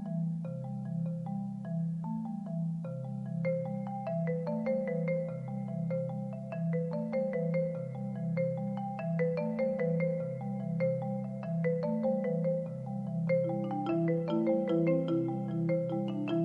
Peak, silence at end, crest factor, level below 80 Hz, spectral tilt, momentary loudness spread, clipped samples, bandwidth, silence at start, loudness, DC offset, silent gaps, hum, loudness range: -18 dBFS; 0 s; 14 dB; -70 dBFS; -10.5 dB/octave; 7 LU; under 0.1%; 4.6 kHz; 0 s; -34 LUFS; under 0.1%; none; none; 4 LU